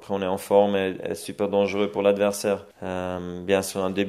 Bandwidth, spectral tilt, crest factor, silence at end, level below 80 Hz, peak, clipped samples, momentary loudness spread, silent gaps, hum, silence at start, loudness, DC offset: 15 kHz; -5 dB/octave; 20 dB; 0 s; -62 dBFS; -4 dBFS; under 0.1%; 11 LU; none; none; 0 s; -24 LUFS; under 0.1%